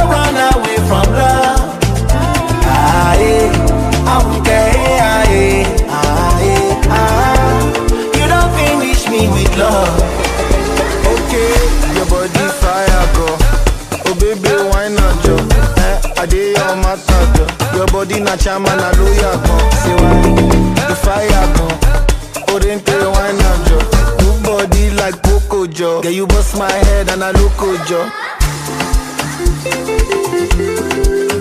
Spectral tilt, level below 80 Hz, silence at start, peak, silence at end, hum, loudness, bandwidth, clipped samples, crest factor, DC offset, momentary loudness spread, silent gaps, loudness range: -5 dB/octave; -14 dBFS; 0 s; 0 dBFS; 0 s; none; -12 LUFS; 15.5 kHz; under 0.1%; 10 dB; under 0.1%; 5 LU; none; 3 LU